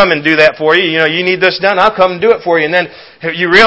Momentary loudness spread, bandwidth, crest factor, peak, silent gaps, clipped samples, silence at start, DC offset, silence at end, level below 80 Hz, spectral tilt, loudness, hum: 7 LU; 8 kHz; 10 dB; 0 dBFS; none; 1%; 0 s; under 0.1%; 0 s; -46 dBFS; -5 dB/octave; -10 LUFS; none